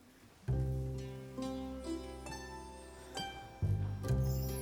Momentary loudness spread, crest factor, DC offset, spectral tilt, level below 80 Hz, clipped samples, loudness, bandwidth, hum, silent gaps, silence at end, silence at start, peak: 12 LU; 16 dB; under 0.1%; -6.5 dB/octave; -46 dBFS; under 0.1%; -40 LUFS; over 20 kHz; none; none; 0 s; 0 s; -22 dBFS